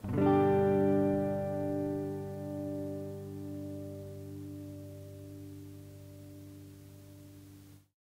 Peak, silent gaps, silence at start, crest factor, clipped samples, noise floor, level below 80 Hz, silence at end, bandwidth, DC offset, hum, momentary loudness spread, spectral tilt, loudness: -16 dBFS; none; 0 s; 18 dB; under 0.1%; -55 dBFS; -64 dBFS; 0.25 s; 16 kHz; under 0.1%; none; 25 LU; -8.5 dB/octave; -33 LUFS